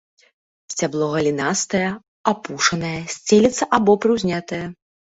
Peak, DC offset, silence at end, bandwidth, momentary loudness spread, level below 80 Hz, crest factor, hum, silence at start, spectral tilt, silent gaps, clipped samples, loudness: -2 dBFS; under 0.1%; 0.4 s; 8 kHz; 11 LU; -54 dBFS; 18 dB; none; 0.7 s; -4 dB/octave; 2.08-2.24 s; under 0.1%; -20 LUFS